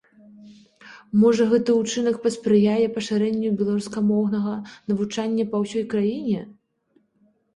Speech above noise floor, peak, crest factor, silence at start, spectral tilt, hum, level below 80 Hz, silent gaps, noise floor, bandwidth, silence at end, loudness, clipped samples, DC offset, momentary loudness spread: 43 dB; -8 dBFS; 16 dB; 0.4 s; -6 dB/octave; none; -62 dBFS; none; -65 dBFS; 11 kHz; 1.05 s; -22 LUFS; under 0.1%; under 0.1%; 8 LU